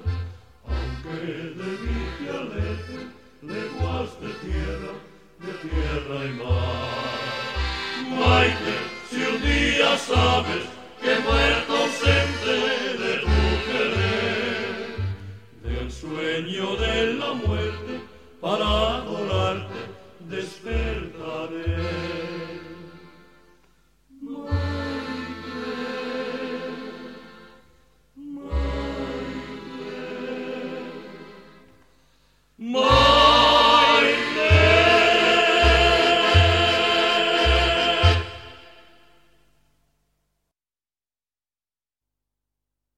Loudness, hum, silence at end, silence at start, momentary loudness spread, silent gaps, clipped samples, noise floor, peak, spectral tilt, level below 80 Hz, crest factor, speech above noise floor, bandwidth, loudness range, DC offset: -22 LUFS; 50 Hz at -60 dBFS; 4.3 s; 0 s; 20 LU; none; under 0.1%; under -90 dBFS; -2 dBFS; -5 dB/octave; -34 dBFS; 20 dB; over 66 dB; 12.5 kHz; 16 LU; 0.2%